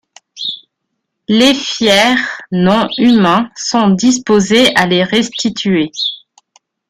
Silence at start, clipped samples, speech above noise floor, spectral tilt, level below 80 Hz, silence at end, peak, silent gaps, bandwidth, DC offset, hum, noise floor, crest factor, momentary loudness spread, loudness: 0.35 s; under 0.1%; 61 dB; -4 dB/octave; -50 dBFS; 0.75 s; 0 dBFS; none; 15 kHz; under 0.1%; none; -72 dBFS; 12 dB; 12 LU; -12 LUFS